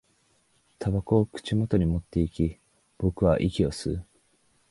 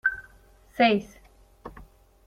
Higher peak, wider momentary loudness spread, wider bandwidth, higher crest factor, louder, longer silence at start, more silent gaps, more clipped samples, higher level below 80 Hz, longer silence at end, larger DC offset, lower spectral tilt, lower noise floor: about the same, -8 dBFS vs -6 dBFS; second, 8 LU vs 25 LU; second, 11.5 kHz vs 14.5 kHz; about the same, 20 dB vs 24 dB; second, -27 LUFS vs -24 LUFS; first, 0.8 s vs 0.05 s; neither; neither; first, -40 dBFS vs -54 dBFS; first, 0.7 s vs 0.45 s; neither; first, -7.5 dB/octave vs -5.5 dB/octave; first, -67 dBFS vs -55 dBFS